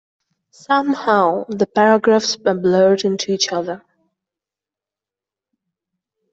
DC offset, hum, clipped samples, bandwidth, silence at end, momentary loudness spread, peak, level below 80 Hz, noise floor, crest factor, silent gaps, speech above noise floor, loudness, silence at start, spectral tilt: under 0.1%; none; under 0.1%; 8 kHz; 2.55 s; 7 LU; -2 dBFS; -62 dBFS; -88 dBFS; 16 dB; none; 72 dB; -16 LUFS; 0.7 s; -4.5 dB/octave